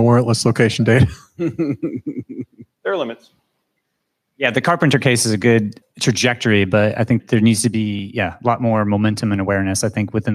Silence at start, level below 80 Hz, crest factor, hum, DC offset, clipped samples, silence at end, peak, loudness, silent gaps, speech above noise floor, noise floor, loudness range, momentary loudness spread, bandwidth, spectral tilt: 0 s; -50 dBFS; 16 dB; none; under 0.1%; under 0.1%; 0 s; 0 dBFS; -17 LUFS; none; 57 dB; -74 dBFS; 8 LU; 13 LU; 15 kHz; -5.5 dB/octave